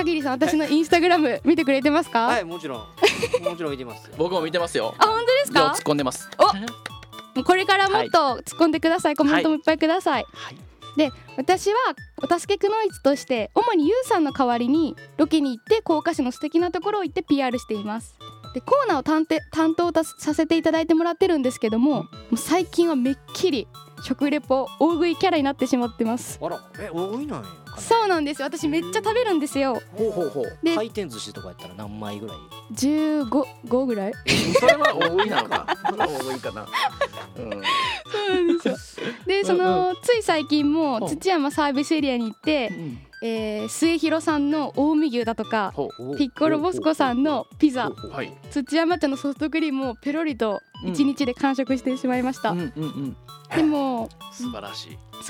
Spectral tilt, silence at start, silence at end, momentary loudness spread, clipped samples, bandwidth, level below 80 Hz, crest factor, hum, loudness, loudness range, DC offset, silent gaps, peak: -4.5 dB/octave; 0 s; 0 s; 13 LU; under 0.1%; 17 kHz; -54 dBFS; 16 dB; none; -22 LUFS; 4 LU; under 0.1%; none; -6 dBFS